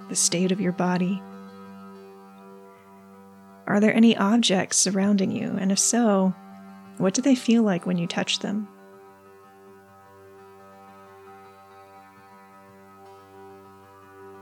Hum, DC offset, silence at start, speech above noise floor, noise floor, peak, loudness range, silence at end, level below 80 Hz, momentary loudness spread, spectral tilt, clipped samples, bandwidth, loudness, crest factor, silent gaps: none; under 0.1%; 0 s; 29 dB; -50 dBFS; -8 dBFS; 10 LU; 0 s; -84 dBFS; 24 LU; -4 dB/octave; under 0.1%; 13.5 kHz; -22 LUFS; 18 dB; none